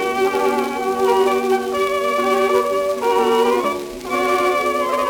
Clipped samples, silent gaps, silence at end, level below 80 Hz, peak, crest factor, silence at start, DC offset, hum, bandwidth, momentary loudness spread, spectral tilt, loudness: under 0.1%; none; 0 s; -52 dBFS; -4 dBFS; 14 dB; 0 s; under 0.1%; none; 19.5 kHz; 5 LU; -3.5 dB/octave; -18 LUFS